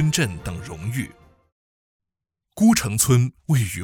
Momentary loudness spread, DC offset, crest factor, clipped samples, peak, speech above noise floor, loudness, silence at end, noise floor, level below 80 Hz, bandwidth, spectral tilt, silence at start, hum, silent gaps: 14 LU; under 0.1%; 20 dB; under 0.1%; -2 dBFS; 64 dB; -21 LUFS; 0 s; -85 dBFS; -46 dBFS; 20 kHz; -5 dB/octave; 0 s; none; 1.52-2.00 s